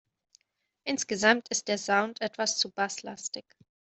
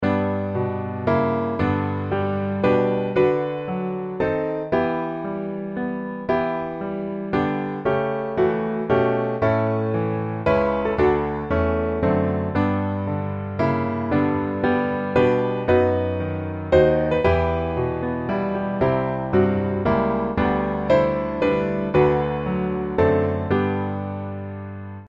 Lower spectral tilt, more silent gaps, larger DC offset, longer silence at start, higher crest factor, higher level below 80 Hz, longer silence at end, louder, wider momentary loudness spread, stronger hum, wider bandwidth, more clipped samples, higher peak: second, -1.5 dB/octave vs -9.5 dB/octave; neither; neither; first, 0.85 s vs 0 s; first, 26 dB vs 18 dB; second, -74 dBFS vs -42 dBFS; first, 0.55 s vs 0 s; second, -29 LUFS vs -22 LUFS; first, 13 LU vs 8 LU; neither; first, 8.4 kHz vs 7.4 kHz; neither; about the same, -6 dBFS vs -4 dBFS